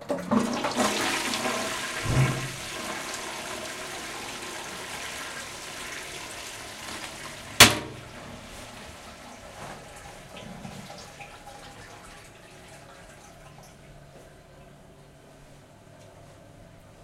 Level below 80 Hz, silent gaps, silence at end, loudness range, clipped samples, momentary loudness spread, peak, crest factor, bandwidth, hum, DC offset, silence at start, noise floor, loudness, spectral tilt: -52 dBFS; none; 0 s; 23 LU; under 0.1%; 22 LU; -2 dBFS; 30 dB; 16 kHz; none; under 0.1%; 0 s; -51 dBFS; -26 LUFS; -2.5 dB/octave